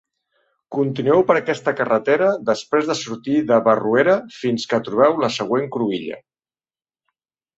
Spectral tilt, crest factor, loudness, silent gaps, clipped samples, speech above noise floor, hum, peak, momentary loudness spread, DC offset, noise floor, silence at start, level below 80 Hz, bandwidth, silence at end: -5.5 dB/octave; 18 dB; -19 LUFS; none; under 0.1%; over 72 dB; none; -2 dBFS; 8 LU; under 0.1%; under -90 dBFS; 0.7 s; -64 dBFS; 8 kHz; 1.4 s